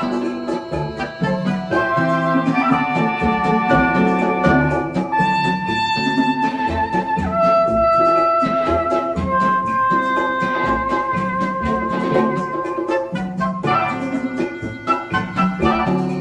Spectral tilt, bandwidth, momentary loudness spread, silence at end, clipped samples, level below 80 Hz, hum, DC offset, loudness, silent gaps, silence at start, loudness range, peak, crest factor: -7 dB/octave; 10.5 kHz; 8 LU; 0 s; under 0.1%; -40 dBFS; none; under 0.1%; -18 LUFS; none; 0 s; 4 LU; -2 dBFS; 16 dB